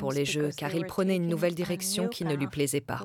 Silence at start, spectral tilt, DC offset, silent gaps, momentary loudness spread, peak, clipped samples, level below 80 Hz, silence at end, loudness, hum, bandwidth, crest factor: 0 s; -5 dB/octave; under 0.1%; none; 3 LU; -14 dBFS; under 0.1%; -62 dBFS; 0 s; -29 LUFS; none; 19 kHz; 16 dB